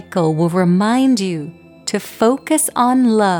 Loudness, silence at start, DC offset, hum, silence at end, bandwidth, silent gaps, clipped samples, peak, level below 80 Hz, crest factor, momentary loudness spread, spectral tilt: -16 LUFS; 0.1 s; under 0.1%; none; 0 s; over 20 kHz; none; under 0.1%; -4 dBFS; -60 dBFS; 12 dB; 10 LU; -5.5 dB/octave